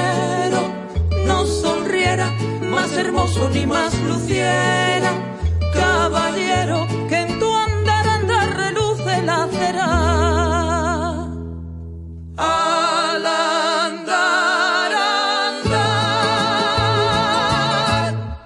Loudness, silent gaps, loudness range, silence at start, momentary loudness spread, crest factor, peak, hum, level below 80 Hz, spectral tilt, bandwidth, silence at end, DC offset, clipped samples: -18 LUFS; none; 3 LU; 0 s; 6 LU; 14 dB; -4 dBFS; none; -36 dBFS; -4.5 dB/octave; 11.5 kHz; 0 s; under 0.1%; under 0.1%